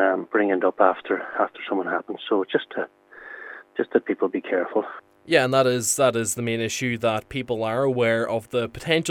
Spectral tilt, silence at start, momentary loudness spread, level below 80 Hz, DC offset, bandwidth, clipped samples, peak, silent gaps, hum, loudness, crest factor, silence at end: -4 dB/octave; 0 s; 12 LU; -60 dBFS; under 0.1%; 19 kHz; under 0.1%; -2 dBFS; none; none; -23 LUFS; 22 dB; 0 s